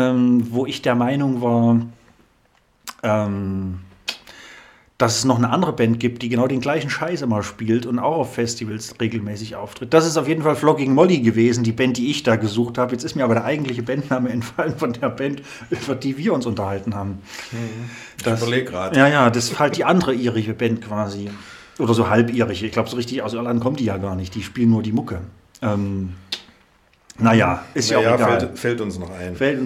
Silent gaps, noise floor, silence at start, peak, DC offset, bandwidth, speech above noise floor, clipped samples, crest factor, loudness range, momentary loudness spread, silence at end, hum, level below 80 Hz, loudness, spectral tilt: none; -59 dBFS; 0 s; -2 dBFS; under 0.1%; 14.5 kHz; 40 dB; under 0.1%; 18 dB; 6 LU; 14 LU; 0 s; none; -54 dBFS; -20 LUFS; -5.5 dB/octave